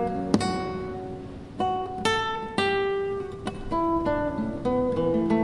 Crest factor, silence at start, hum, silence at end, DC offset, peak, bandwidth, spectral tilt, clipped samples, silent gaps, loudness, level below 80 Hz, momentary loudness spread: 20 dB; 0 s; none; 0 s; under 0.1%; -6 dBFS; 11.5 kHz; -5.5 dB/octave; under 0.1%; none; -27 LUFS; -46 dBFS; 10 LU